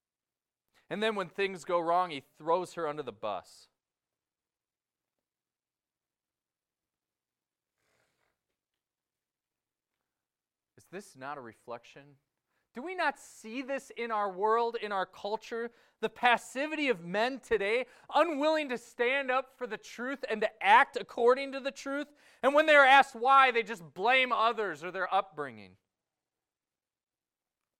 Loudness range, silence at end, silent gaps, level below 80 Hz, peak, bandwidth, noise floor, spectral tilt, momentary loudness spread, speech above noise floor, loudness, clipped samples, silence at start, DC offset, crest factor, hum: 19 LU; 2.15 s; none; -74 dBFS; -8 dBFS; 15 kHz; under -90 dBFS; -3.5 dB/octave; 19 LU; over 60 dB; -29 LUFS; under 0.1%; 0.9 s; under 0.1%; 24 dB; none